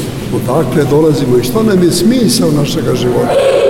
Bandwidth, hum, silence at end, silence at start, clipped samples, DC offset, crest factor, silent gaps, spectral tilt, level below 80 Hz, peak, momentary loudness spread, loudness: 17 kHz; none; 0 s; 0 s; under 0.1%; under 0.1%; 10 dB; none; -5.5 dB/octave; -34 dBFS; 0 dBFS; 4 LU; -11 LUFS